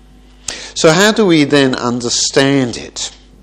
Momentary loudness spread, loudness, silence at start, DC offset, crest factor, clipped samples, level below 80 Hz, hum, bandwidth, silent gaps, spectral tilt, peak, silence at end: 15 LU; -12 LUFS; 0.5 s; under 0.1%; 14 dB; 0.2%; -44 dBFS; none; 13 kHz; none; -3.5 dB/octave; 0 dBFS; 0.35 s